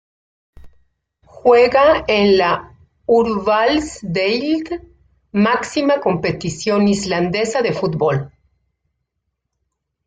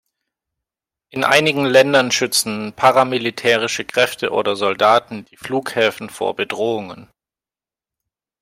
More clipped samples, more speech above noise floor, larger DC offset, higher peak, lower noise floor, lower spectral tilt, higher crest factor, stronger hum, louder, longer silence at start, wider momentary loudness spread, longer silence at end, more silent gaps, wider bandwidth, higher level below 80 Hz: neither; second, 59 dB vs over 73 dB; neither; about the same, -2 dBFS vs 0 dBFS; second, -75 dBFS vs under -90 dBFS; first, -5.5 dB/octave vs -3 dB/octave; about the same, 16 dB vs 18 dB; neither; about the same, -16 LUFS vs -17 LUFS; second, 0.65 s vs 1.15 s; about the same, 11 LU vs 11 LU; first, 1.8 s vs 1.35 s; neither; second, 9.4 kHz vs 16 kHz; first, -48 dBFS vs -62 dBFS